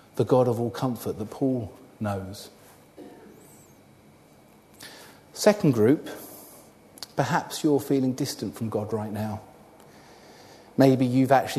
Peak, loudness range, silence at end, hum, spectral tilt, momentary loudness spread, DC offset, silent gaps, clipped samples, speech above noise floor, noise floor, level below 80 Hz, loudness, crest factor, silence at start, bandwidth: -4 dBFS; 13 LU; 0 s; none; -6.5 dB/octave; 23 LU; under 0.1%; none; under 0.1%; 31 dB; -54 dBFS; -64 dBFS; -25 LUFS; 22 dB; 0.15 s; 13.5 kHz